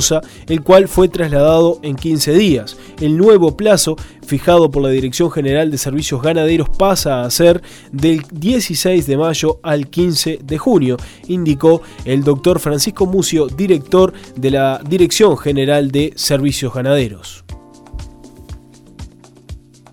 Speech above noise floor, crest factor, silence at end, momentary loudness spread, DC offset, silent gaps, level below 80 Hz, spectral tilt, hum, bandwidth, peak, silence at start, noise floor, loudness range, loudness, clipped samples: 22 dB; 14 dB; 0.35 s; 8 LU; under 0.1%; none; -34 dBFS; -5 dB/octave; none; 18.5 kHz; 0 dBFS; 0 s; -35 dBFS; 3 LU; -14 LUFS; under 0.1%